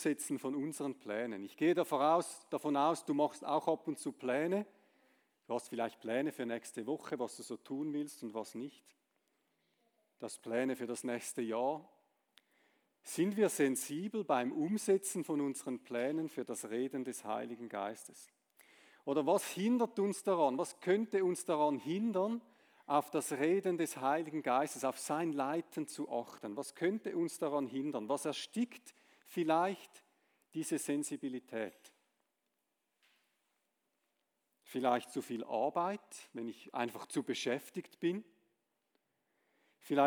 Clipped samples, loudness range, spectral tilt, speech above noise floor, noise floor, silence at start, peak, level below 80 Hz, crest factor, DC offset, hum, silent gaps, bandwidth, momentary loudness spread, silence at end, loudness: under 0.1%; 8 LU; -4.5 dB/octave; 48 dB; -85 dBFS; 0 s; -18 dBFS; under -90 dBFS; 20 dB; under 0.1%; none; none; over 20 kHz; 11 LU; 0 s; -37 LUFS